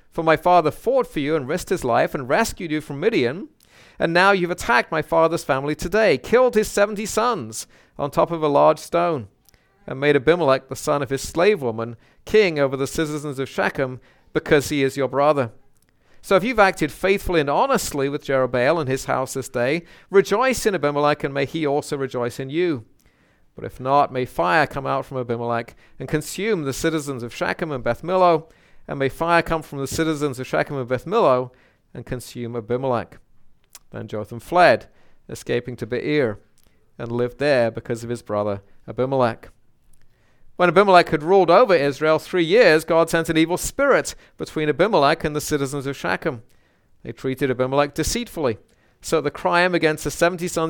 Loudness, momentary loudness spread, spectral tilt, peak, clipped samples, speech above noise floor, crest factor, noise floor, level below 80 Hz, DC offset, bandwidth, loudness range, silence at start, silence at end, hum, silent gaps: -20 LUFS; 13 LU; -5 dB/octave; 0 dBFS; under 0.1%; 37 dB; 20 dB; -58 dBFS; -46 dBFS; under 0.1%; 19 kHz; 6 LU; 0.15 s; 0 s; none; none